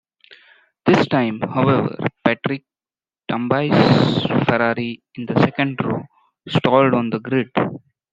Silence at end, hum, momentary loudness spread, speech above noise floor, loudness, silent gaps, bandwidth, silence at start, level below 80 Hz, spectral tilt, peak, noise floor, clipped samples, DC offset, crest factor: 0.35 s; none; 11 LU; over 72 dB; -19 LUFS; none; 7.8 kHz; 0.3 s; -56 dBFS; -7.5 dB/octave; -2 dBFS; under -90 dBFS; under 0.1%; under 0.1%; 18 dB